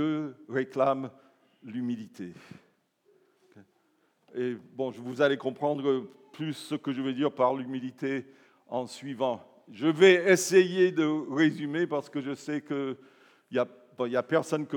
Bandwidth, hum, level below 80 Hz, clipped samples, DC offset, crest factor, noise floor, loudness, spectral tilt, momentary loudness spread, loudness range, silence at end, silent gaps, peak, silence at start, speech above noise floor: 18 kHz; none; under -90 dBFS; under 0.1%; under 0.1%; 22 dB; -70 dBFS; -28 LUFS; -5 dB/octave; 15 LU; 15 LU; 0 s; none; -6 dBFS; 0 s; 42 dB